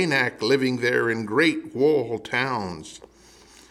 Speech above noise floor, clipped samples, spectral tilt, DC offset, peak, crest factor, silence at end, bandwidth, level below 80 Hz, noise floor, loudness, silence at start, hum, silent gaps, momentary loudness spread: 28 dB; under 0.1%; -5 dB/octave; under 0.1%; -8 dBFS; 16 dB; 0.75 s; 13 kHz; -62 dBFS; -51 dBFS; -23 LUFS; 0 s; none; none; 10 LU